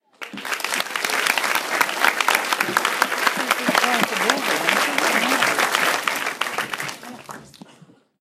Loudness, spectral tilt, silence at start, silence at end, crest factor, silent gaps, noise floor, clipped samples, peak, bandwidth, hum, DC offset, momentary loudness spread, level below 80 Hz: -20 LUFS; -1 dB/octave; 0.2 s; 0.75 s; 22 dB; none; -51 dBFS; under 0.1%; 0 dBFS; 16 kHz; none; under 0.1%; 12 LU; -70 dBFS